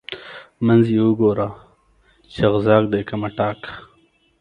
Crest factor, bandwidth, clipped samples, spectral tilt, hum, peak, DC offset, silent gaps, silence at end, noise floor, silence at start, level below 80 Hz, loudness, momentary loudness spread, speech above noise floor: 20 dB; 5.4 kHz; under 0.1%; -9 dB/octave; none; 0 dBFS; under 0.1%; none; 0.6 s; -58 dBFS; 0.1 s; -50 dBFS; -18 LUFS; 20 LU; 41 dB